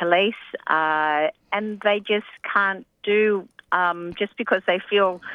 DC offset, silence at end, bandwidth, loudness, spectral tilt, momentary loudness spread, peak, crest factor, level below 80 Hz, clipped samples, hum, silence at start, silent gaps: under 0.1%; 0 s; 5 kHz; -22 LUFS; -6.5 dB/octave; 7 LU; -2 dBFS; 20 dB; -68 dBFS; under 0.1%; none; 0 s; none